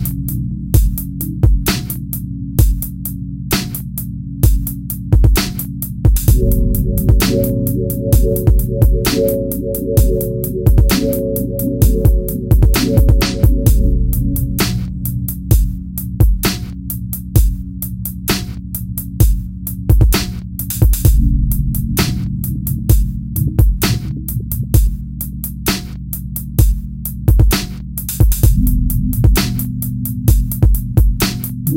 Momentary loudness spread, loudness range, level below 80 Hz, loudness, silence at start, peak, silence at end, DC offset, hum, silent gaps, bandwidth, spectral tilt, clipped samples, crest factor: 10 LU; 4 LU; -16 dBFS; -16 LUFS; 0 s; 0 dBFS; 0 s; under 0.1%; none; none; 17.5 kHz; -5.5 dB/octave; under 0.1%; 14 dB